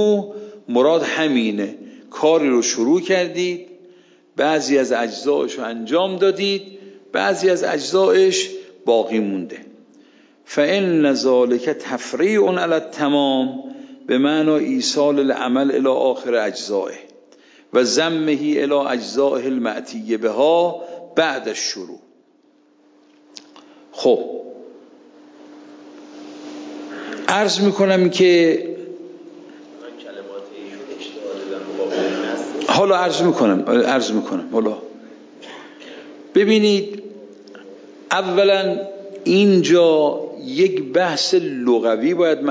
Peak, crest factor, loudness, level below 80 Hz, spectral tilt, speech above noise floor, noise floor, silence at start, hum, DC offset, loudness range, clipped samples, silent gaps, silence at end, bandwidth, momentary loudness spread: 0 dBFS; 20 dB; -18 LUFS; -72 dBFS; -4.5 dB/octave; 39 dB; -56 dBFS; 0 s; none; under 0.1%; 9 LU; under 0.1%; none; 0 s; 7.8 kHz; 19 LU